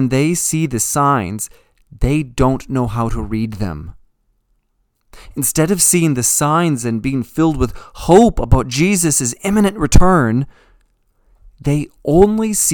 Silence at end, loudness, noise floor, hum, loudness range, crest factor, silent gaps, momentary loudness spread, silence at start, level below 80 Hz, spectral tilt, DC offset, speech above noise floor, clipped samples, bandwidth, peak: 0 s; -15 LUFS; -64 dBFS; none; 7 LU; 16 dB; none; 11 LU; 0 s; -26 dBFS; -5 dB/octave; under 0.1%; 50 dB; 0.2%; 19 kHz; 0 dBFS